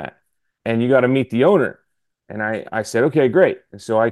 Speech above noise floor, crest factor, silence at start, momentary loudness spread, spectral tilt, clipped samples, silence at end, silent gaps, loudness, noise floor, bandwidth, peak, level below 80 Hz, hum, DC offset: 51 dB; 16 dB; 0 s; 14 LU; -6.5 dB/octave; under 0.1%; 0 s; none; -18 LUFS; -68 dBFS; 12.5 kHz; -2 dBFS; -64 dBFS; none; under 0.1%